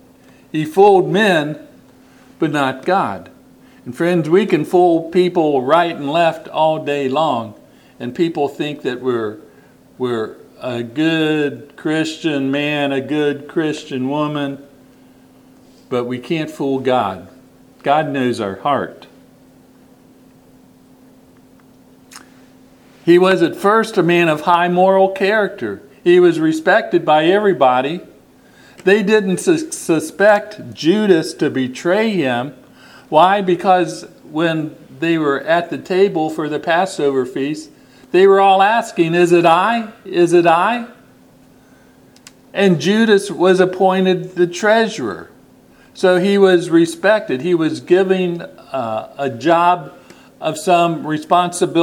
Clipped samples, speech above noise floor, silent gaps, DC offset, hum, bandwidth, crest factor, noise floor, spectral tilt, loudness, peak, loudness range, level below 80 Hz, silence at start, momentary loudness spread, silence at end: under 0.1%; 32 dB; none; under 0.1%; none; 15 kHz; 16 dB; -47 dBFS; -5.5 dB/octave; -16 LUFS; 0 dBFS; 8 LU; -62 dBFS; 0.55 s; 12 LU; 0 s